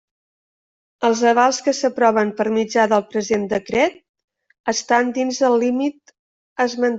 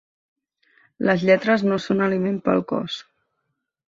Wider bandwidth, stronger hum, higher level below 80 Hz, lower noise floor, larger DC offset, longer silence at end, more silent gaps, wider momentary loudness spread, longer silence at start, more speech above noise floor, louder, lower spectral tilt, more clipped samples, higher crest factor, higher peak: about the same, 8 kHz vs 7.6 kHz; neither; about the same, -62 dBFS vs -62 dBFS; first, under -90 dBFS vs -77 dBFS; neither; second, 0 s vs 0.85 s; first, 4.09-4.14 s, 4.24-4.28 s, 4.60-4.64 s, 6.19-6.56 s vs none; about the same, 7 LU vs 9 LU; about the same, 1 s vs 1 s; first, over 72 dB vs 57 dB; about the same, -19 LUFS vs -21 LUFS; second, -3.5 dB/octave vs -7 dB/octave; neither; about the same, 16 dB vs 20 dB; about the same, -2 dBFS vs -4 dBFS